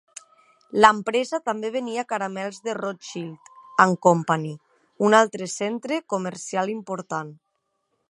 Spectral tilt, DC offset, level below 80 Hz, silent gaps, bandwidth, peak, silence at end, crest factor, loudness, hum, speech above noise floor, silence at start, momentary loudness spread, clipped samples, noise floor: -4.5 dB/octave; under 0.1%; -70 dBFS; none; 11.5 kHz; 0 dBFS; 0.75 s; 24 dB; -23 LUFS; none; 52 dB; 0.75 s; 17 LU; under 0.1%; -75 dBFS